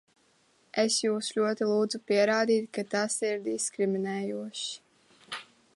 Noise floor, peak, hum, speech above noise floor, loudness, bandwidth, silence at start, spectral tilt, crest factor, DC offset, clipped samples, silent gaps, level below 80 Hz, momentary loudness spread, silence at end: -66 dBFS; -12 dBFS; none; 38 dB; -29 LUFS; 11.5 kHz; 0.75 s; -3.5 dB/octave; 18 dB; under 0.1%; under 0.1%; none; -82 dBFS; 13 LU; 0.3 s